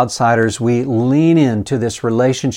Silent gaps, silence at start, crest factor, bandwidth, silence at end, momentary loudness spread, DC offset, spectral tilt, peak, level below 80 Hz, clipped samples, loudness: none; 0 s; 14 dB; 12.5 kHz; 0 s; 6 LU; under 0.1%; -6 dB/octave; 0 dBFS; -48 dBFS; under 0.1%; -15 LUFS